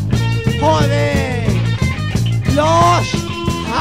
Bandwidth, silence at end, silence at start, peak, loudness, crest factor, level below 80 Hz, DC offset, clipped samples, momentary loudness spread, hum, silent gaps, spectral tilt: 15 kHz; 0 s; 0 s; -2 dBFS; -15 LUFS; 14 dB; -30 dBFS; 0.9%; under 0.1%; 7 LU; none; none; -6 dB/octave